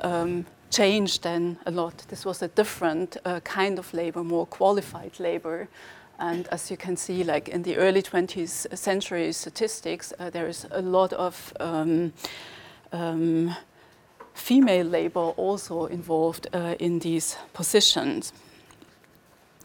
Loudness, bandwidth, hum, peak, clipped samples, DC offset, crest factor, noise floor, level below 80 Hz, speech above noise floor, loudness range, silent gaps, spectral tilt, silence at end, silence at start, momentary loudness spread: -26 LUFS; 19 kHz; none; -6 dBFS; under 0.1%; under 0.1%; 20 dB; -57 dBFS; -66 dBFS; 31 dB; 4 LU; none; -4 dB/octave; 1.35 s; 0 s; 13 LU